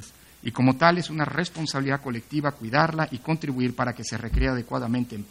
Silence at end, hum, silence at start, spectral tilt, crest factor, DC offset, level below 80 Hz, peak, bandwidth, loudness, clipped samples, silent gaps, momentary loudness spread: 0.05 s; none; 0 s; -6 dB/octave; 22 dB; under 0.1%; -38 dBFS; -2 dBFS; 16 kHz; -25 LUFS; under 0.1%; none; 8 LU